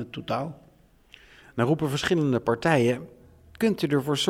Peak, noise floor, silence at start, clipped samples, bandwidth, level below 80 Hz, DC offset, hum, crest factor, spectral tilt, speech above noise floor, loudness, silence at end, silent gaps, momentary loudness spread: -8 dBFS; -58 dBFS; 0 s; under 0.1%; 16.5 kHz; -58 dBFS; under 0.1%; none; 18 dB; -5.5 dB/octave; 33 dB; -25 LUFS; 0 s; none; 9 LU